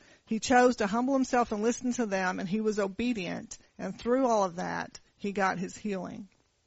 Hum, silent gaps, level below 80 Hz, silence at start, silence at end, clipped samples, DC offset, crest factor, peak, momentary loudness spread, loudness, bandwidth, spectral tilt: none; none; -60 dBFS; 0.3 s; 0.4 s; under 0.1%; under 0.1%; 20 dB; -10 dBFS; 14 LU; -29 LUFS; 8 kHz; -4.5 dB/octave